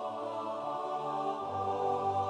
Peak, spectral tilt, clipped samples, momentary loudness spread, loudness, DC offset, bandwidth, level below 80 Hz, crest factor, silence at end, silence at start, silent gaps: -20 dBFS; -6.5 dB/octave; under 0.1%; 5 LU; -35 LUFS; under 0.1%; 9.8 kHz; -78 dBFS; 14 dB; 0 s; 0 s; none